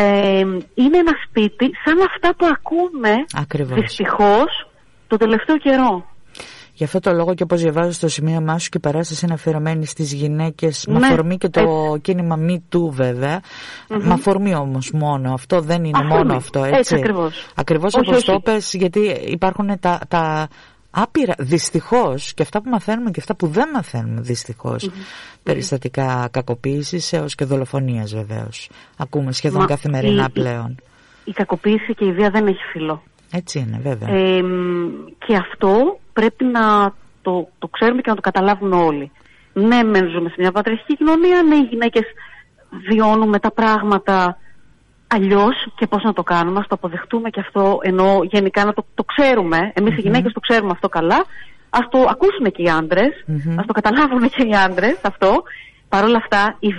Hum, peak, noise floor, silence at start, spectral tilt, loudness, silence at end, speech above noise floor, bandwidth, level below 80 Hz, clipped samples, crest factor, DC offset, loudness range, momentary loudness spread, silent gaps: none; -4 dBFS; -50 dBFS; 0 s; -6 dB/octave; -17 LUFS; 0 s; 33 dB; 11.5 kHz; -46 dBFS; under 0.1%; 12 dB; under 0.1%; 5 LU; 10 LU; none